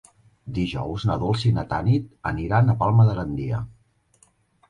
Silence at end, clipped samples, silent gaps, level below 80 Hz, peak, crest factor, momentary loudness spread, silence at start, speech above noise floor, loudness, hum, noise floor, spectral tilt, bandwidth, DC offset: 1 s; under 0.1%; none; -42 dBFS; -8 dBFS; 16 dB; 12 LU; 0.45 s; 39 dB; -23 LUFS; none; -61 dBFS; -8 dB/octave; 9.8 kHz; under 0.1%